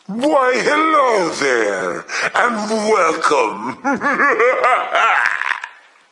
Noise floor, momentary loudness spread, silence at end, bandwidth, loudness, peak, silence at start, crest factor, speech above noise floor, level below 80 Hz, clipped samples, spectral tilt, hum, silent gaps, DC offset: -36 dBFS; 8 LU; 0.4 s; 11.5 kHz; -16 LUFS; 0 dBFS; 0.1 s; 16 dB; 20 dB; -68 dBFS; under 0.1%; -3 dB/octave; none; none; under 0.1%